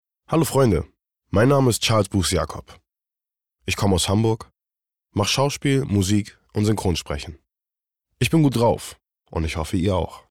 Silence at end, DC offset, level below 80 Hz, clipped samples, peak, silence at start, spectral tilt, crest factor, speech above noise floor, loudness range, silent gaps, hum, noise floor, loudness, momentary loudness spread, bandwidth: 0.1 s; under 0.1%; -42 dBFS; under 0.1%; -8 dBFS; 0.3 s; -5.5 dB/octave; 14 dB; 67 dB; 3 LU; none; none; -87 dBFS; -21 LUFS; 13 LU; 17 kHz